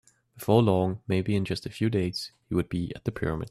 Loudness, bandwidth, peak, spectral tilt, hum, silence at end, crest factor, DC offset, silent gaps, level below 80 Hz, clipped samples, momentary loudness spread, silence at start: -28 LUFS; 14 kHz; -8 dBFS; -7 dB/octave; none; 0 s; 20 dB; under 0.1%; none; -52 dBFS; under 0.1%; 10 LU; 0.35 s